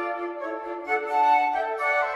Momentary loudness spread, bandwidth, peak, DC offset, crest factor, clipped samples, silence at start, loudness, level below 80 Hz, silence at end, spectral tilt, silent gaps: 12 LU; 12 kHz; -10 dBFS; under 0.1%; 14 dB; under 0.1%; 0 s; -25 LUFS; -68 dBFS; 0 s; -3 dB/octave; none